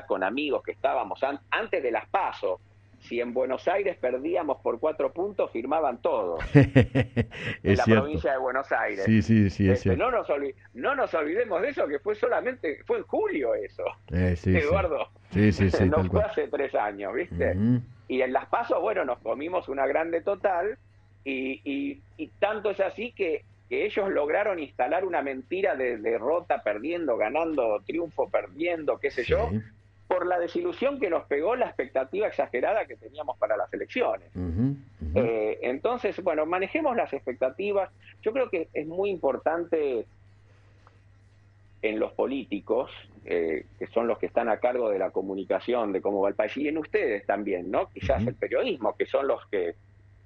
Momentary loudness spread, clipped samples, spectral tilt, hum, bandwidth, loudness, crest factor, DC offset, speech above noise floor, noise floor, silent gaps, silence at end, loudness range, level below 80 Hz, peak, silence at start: 8 LU; under 0.1%; -8 dB/octave; none; 8.4 kHz; -27 LUFS; 24 dB; under 0.1%; 30 dB; -56 dBFS; none; 0.55 s; 6 LU; -48 dBFS; -4 dBFS; 0 s